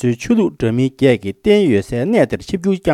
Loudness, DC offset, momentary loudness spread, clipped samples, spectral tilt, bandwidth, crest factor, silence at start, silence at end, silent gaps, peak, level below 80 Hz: -16 LUFS; under 0.1%; 5 LU; under 0.1%; -7 dB/octave; 13 kHz; 14 dB; 0 s; 0 s; none; 0 dBFS; -42 dBFS